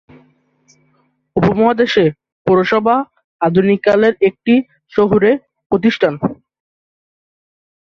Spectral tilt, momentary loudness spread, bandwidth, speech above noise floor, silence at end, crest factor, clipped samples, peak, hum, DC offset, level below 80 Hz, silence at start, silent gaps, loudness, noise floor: -7.5 dB/octave; 9 LU; 7 kHz; 47 dB; 1.6 s; 14 dB; under 0.1%; -2 dBFS; none; under 0.1%; -50 dBFS; 1.35 s; 2.32-2.45 s, 3.24-3.39 s, 5.66-5.70 s; -14 LUFS; -60 dBFS